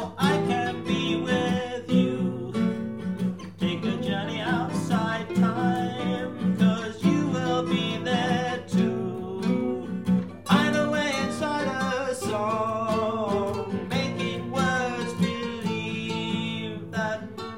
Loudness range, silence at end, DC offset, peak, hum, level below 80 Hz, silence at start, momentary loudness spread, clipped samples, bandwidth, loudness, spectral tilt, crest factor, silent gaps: 2 LU; 0 s; 0.2%; -6 dBFS; none; -58 dBFS; 0 s; 6 LU; under 0.1%; 15.5 kHz; -26 LUFS; -6 dB/octave; 20 dB; none